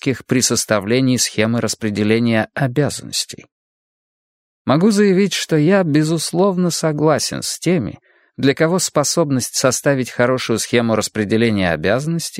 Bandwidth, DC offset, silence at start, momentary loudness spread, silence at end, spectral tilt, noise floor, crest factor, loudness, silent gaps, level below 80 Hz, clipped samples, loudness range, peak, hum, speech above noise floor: 16 kHz; under 0.1%; 0.05 s; 6 LU; 0 s; -4.5 dB/octave; under -90 dBFS; 16 dB; -17 LUFS; 3.52-4.65 s; -54 dBFS; under 0.1%; 3 LU; 0 dBFS; none; over 74 dB